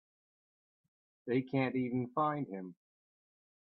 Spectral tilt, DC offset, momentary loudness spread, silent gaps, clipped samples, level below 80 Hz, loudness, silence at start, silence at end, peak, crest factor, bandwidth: -10.5 dB/octave; under 0.1%; 14 LU; none; under 0.1%; -80 dBFS; -35 LUFS; 1.25 s; 0.95 s; -20 dBFS; 20 dB; 4.9 kHz